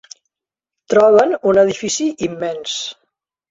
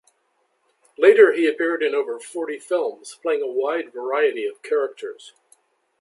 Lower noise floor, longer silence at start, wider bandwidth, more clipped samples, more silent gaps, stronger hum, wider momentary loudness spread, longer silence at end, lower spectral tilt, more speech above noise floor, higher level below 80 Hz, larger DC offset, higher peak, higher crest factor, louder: first, -87 dBFS vs -68 dBFS; about the same, 0.9 s vs 1 s; second, 8 kHz vs 11.5 kHz; neither; neither; neither; second, 12 LU vs 15 LU; second, 0.6 s vs 0.75 s; about the same, -3.5 dB/octave vs -3 dB/octave; first, 72 dB vs 48 dB; first, -58 dBFS vs -78 dBFS; neither; about the same, -2 dBFS vs -2 dBFS; about the same, 16 dB vs 20 dB; first, -15 LUFS vs -21 LUFS